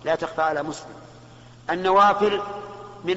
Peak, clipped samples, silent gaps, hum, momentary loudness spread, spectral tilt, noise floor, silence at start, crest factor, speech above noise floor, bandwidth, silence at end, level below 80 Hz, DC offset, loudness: -8 dBFS; under 0.1%; none; none; 20 LU; -2.5 dB/octave; -46 dBFS; 0.05 s; 16 dB; 24 dB; 8 kHz; 0 s; -58 dBFS; under 0.1%; -22 LUFS